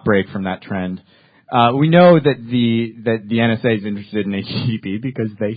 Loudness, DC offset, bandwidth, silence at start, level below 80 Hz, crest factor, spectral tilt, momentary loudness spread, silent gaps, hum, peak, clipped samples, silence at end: -17 LUFS; under 0.1%; 5 kHz; 0.05 s; -50 dBFS; 16 dB; -11 dB/octave; 14 LU; none; none; 0 dBFS; under 0.1%; 0 s